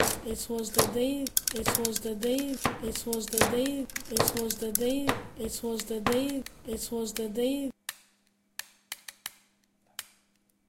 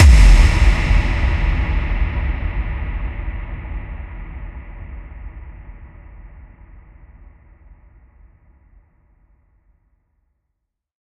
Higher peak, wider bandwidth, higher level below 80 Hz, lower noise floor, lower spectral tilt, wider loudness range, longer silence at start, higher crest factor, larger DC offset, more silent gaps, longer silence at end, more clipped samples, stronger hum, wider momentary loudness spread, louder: second, -4 dBFS vs 0 dBFS; first, 17 kHz vs 10.5 kHz; second, -52 dBFS vs -18 dBFS; second, -70 dBFS vs -76 dBFS; second, -3 dB/octave vs -5.5 dB/octave; second, 8 LU vs 25 LU; about the same, 0 s vs 0 s; first, 28 dB vs 18 dB; neither; neither; second, 0.65 s vs 4.6 s; neither; neither; second, 17 LU vs 26 LU; second, -30 LUFS vs -19 LUFS